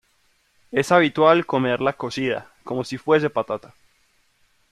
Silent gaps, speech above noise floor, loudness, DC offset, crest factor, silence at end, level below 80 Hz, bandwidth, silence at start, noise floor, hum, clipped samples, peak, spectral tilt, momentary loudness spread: none; 43 dB; -21 LUFS; under 0.1%; 20 dB; 1.05 s; -62 dBFS; 13 kHz; 0.7 s; -64 dBFS; none; under 0.1%; -2 dBFS; -5.5 dB/octave; 13 LU